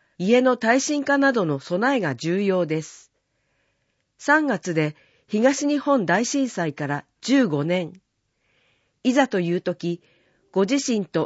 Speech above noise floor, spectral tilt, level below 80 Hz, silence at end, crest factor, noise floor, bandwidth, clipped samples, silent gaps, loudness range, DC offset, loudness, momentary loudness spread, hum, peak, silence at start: 50 dB; -5 dB/octave; -72 dBFS; 0 s; 18 dB; -72 dBFS; 8 kHz; under 0.1%; none; 3 LU; under 0.1%; -22 LUFS; 10 LU; none; -6 dBFS; 0.2 s